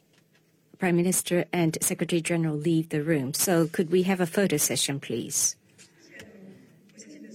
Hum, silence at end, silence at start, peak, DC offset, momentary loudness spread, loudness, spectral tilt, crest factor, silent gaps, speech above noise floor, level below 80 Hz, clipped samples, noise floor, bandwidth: none; 0 s; 0.8 s; -10 dBFS; under 0.1%; 5 LU; -25 LUFS; -4 dB/octave; 18 dB; none; 39 dB; -68 dBFS; under 0.1%; -64 dBFS; 16.5 kHz